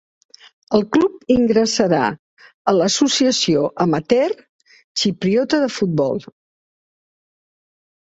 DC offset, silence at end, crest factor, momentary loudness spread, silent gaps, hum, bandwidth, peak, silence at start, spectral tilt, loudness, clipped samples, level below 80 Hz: under 0.1%; 1.85 s; 18 dB; 8 LU; 2.19-2.37 s, 2.54-2.65 s, 4.49-4.59 s, 4.84-4.95 s; none; 8.2 kHz; -2 dBFS; 0.7 s; -4.5 dB/octave; -18 LUFS; under 0.1%; -54 dBFS